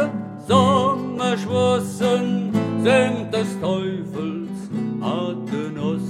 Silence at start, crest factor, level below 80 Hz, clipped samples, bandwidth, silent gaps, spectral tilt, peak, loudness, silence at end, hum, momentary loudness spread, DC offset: 0 s; 20 dB; -62 dBFS; under 0.1%; 14 kHz; none; -6 dB/octave; -2 dBFS; -21 LUFS; 0 s; none; 10 LU; under 0.1%